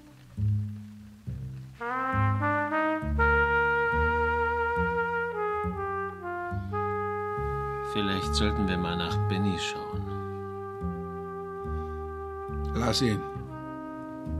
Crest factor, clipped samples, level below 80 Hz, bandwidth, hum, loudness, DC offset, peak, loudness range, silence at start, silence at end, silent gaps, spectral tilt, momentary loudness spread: 18 dB; under 0.1%; -40 dBFS; 13.5 kHz; none; -29 LUFS; under 0.1%; -10 dBFS; 6 LU; 0 s; 0 s; none; -6 dB/octave; 13 LU